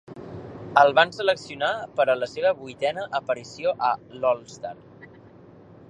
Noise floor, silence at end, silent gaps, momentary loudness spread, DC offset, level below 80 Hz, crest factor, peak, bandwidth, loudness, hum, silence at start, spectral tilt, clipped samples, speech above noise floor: -49 dBFS; 0.85 s; none; 20 LU; under 0.1%; -64 dBFS; 24 dB; -2 dBFS; 10 kHz; -24 LUFS; none; 0.1 s; -4 dB/octave; under 0.1%; 25 dB